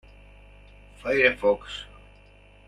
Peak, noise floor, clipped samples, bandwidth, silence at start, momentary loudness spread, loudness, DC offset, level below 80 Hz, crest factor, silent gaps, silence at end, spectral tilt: -6 dBFS; -53 dBFS; under 0.1%; 10.5 kHz; 1.05 s; 18 LU; -23 LUFS; under 0.1%; -50 dBFS; 22 dB; none; 0.8 s; -4.5 dB/octave